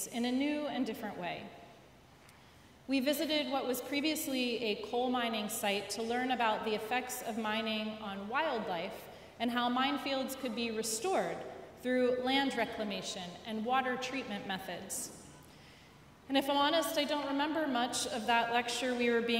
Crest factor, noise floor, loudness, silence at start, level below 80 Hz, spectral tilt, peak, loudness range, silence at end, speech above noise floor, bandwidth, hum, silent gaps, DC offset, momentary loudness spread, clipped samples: 20 dB; -59 dBFS; -34 LUFS; 0 s; -70 dBFS; -3 dB/octave; -16 dBFS; 4 LU; 0 s; 25 dB; 16 kHz; none; none; under 0.1%; 10 LU; under 0.1%